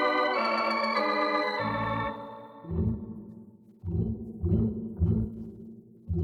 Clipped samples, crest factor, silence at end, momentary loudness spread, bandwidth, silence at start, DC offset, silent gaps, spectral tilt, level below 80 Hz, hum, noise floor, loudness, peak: under 0.1%; 16 dB; 0 s; 18 LU; 9.6 kHz; 0 s; under 0.1%; none; -7.5 dB/octave; -44 dBFS; none; -51 dBFS; -29 LUFS; -14 dBFS